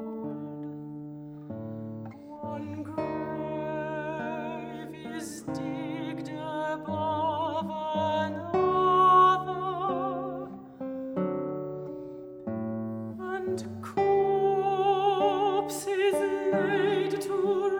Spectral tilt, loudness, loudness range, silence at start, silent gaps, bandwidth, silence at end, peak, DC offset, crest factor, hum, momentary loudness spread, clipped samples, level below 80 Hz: -6 dB/octave; -29 LUFS; 10 LU; 0 s; none; over 20 kHz; 0 s; -10 dBFS; under 0.1%; 18 dB; none; 15 LU; under 0.1%; -68 dBFS